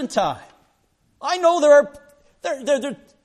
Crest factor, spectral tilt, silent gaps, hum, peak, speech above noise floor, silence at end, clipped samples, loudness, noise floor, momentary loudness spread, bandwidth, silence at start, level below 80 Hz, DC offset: 16 dB; -3.5 dB/octave; none; none; -4 dBFS; 45 dB; 0.3 s; under 0.1%; -19 LUFS; -64 dBFS; 17 LU; 11.5 kHz; 0 s; -62 dBFS; under 0.1%